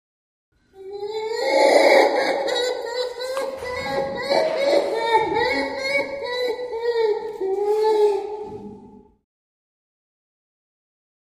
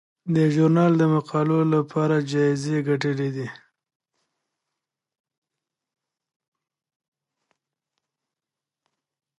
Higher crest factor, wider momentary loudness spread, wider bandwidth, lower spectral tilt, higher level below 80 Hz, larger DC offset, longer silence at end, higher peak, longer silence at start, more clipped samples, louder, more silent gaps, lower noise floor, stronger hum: about the same, 20 dB vs 18 dB; first, 13 LU vs 8 LU; first, 15.5 kHz vs 10.5 kHz; second, -3 dB/octave vs -8 dB/octave; first, -58 dBFS vs -70 dBFS; neither; second, 2.3 s vs 5.85 s; first, -2 dBFS vs -8 dBFS; first, 0.75 s vs 0.25 s; neither; about the same, -21 LUFS vs -22 LUFS; neither; second, -46 dBFS vs -88 dBFS; neither